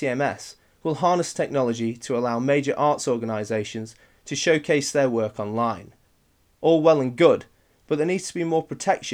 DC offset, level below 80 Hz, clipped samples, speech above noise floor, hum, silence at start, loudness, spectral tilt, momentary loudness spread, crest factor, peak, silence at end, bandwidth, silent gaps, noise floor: under 0.1%; -64 dBFS; under 0.1%; 40 dB; none; 0 s; -23 LUFS; -5 dB/octave; 11 LU; 20 dB; -4 dBFS; 0 s; 14.5 kHz; none; -63 dBFS